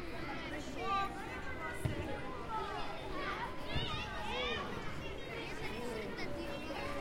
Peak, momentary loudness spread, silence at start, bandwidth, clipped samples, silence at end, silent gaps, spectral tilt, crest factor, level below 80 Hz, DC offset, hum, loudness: -22 dBFS; 6 LU; 0 s; 16.5 kHz; under 0.1%; 0 s; none; -5 dB/octave; 18 dB; -52 dBFS; under 0.1%; none; -41 LUFS